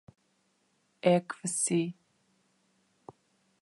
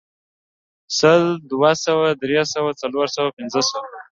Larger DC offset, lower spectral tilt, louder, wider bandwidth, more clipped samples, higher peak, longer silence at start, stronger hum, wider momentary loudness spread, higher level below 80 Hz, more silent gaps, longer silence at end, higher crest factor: neither; about the same, -4.5 dB/octave vs -4 dB/octave; second, -30 LUFS vs -19 LUFS; first, 11.5 kHz vs 7.8 kHz; neither; second, -12 dBFS vs -2 dBFS; first, 1.05 s vs 0.9 s; neither; about the same, 7 LU vs 8 LU; second, -82 dBFS vs -64 dBFS; second, none vs 3.33-3.37 s; first, 1.7 s vs 0.15 s; about the same, 22 dB vs 18 dB